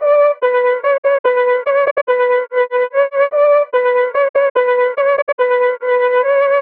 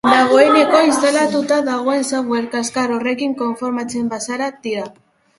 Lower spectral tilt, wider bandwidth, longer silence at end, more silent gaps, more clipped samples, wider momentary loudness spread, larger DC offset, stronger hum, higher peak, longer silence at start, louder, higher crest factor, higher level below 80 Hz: about the same, -4 dB/octave vs -3 dB/octave; second, 4.4 kHz vs 11.5 kHz; second, 0 s vs 0.5 s; first, 0.98-1.03 s, 1.19-1.24 s, 1.91-1.96 s, 2.02-2.07 s, 4.29-4.34 s, 4.50-4.55 s, 5.22-5.27 s, 5.33-5.38 s vs none; neither; second, 3 LU vs 12 LU; neither; neither; second, -4 dBFS vs 0 dBFS; about the same, 0 s vs 0.05 s; about the same, -14 LUFS vs -16 LUFS; second, 10 dB vs 16 dB; second, -70 dBFS vs -60 dBFS